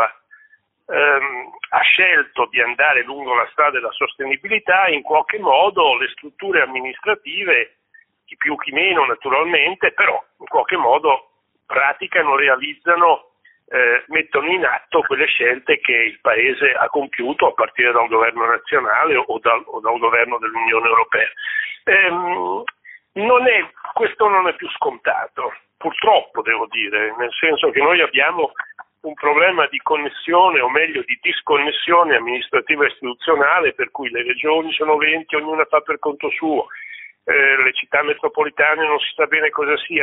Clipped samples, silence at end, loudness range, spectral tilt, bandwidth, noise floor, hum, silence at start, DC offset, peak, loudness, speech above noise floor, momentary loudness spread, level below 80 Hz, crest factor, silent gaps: under 0.1%; 0 s; 2 LU; 1 dB/octave; 4 kHz; -54 dBFS; none; 0 s; under 0.1%; 0 dBFS; -16 LUFS; 37 dB; 9 LU; -64 dBFS; 18 dB; none